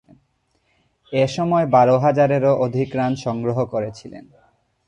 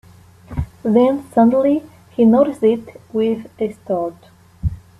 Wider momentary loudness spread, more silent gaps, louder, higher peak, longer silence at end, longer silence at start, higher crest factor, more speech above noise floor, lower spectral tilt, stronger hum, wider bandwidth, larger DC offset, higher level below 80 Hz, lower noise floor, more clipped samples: about the same, 12 LU vs 14 LU; neither; about the same, -19 LUFS vs -18 LUFS; about the same, -4 dBFS vs -2 dBFS; first, 0.65 s vs 0.25 s; first, 1.1 s vs 0.5 s; about the same, 16 dB vs 16 dB; first, 48 dB vs 26 dB; second, -7.5 dB/octave vs -9 dB/octave; neither; about the same, 10 kHz vs 11 kHz; neither; second, -56 dBFS vs -38 dBFS; first, -66 dBFS vs -42 dBFS; neither